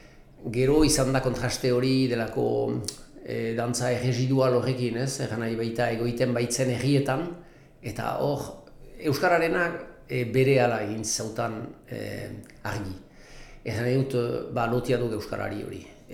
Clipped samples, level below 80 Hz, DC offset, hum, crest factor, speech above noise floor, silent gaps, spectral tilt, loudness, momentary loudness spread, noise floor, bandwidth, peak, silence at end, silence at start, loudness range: under 0.1%; -46 dBFS; under 0.1%; none; 18 dB; 20 dB; none; -5.5 dB/octave; -26 LUFS; 15 LU; -46 dBFS; 16.5 kHz; -10 dBFS; 0 s; 0.05 s; 5 LU